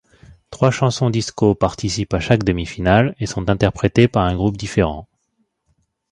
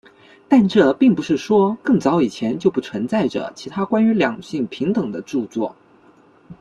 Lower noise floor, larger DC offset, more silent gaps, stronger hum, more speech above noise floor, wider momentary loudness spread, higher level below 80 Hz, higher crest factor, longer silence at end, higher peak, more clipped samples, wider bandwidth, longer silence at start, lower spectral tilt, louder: first, -68 dBFS vs -51 dBFS; neither; neither; neither; first, 51 dB vs 33 dB; second, 6 LU vs 11 LU; first, -36 dBFS vs -58 dBFS; about the same, 18 dB vs 16 dB; first, 1.05 s vs 0.1 s; about the same, 0 dBFS vs -2 dBFS; neither; about the same, 10.5 kHz vs 10 kHz; second, 0.3 s vs 0.5 s; about the same, -6 dB/octave vs -7 dB/octave; about the same, -18 LUFS vs -19 LUFS